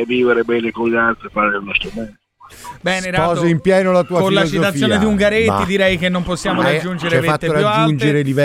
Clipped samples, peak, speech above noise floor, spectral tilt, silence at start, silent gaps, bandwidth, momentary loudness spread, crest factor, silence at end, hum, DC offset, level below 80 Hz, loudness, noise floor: under 0.1%; -2 dBFS; 21 dB; -5.5 dB/octave; 0 s; none; 16 kHz; 5 LU; 14 dB; 0 s; none; under 0.1%; -40 dBFS; -15 LUFS; -37 dBFS